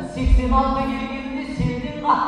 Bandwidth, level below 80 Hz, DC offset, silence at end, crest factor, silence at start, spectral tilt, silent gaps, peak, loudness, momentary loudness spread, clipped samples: 9.4 kHz; -24 dBFS; under 0.1%; 0 s; 16 dB; 0 s; -7.5 dB/octave; none; -4 dBFS; -22 LUFS; 9 LU; under 0.1%